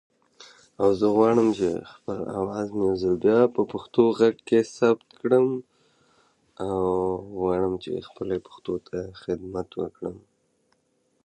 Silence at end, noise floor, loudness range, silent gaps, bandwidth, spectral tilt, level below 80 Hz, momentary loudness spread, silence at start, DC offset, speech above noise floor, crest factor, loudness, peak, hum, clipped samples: 1.1 s; -70 dBFS; 8 LU; none; 9.4 kHz; -7 dB/octave; -56 dBFS; 13 LU; 0.4 s; under 0.1%; 46 dB; 20 dB; -25 LUFS; -6 dBFS; none; under 0.1%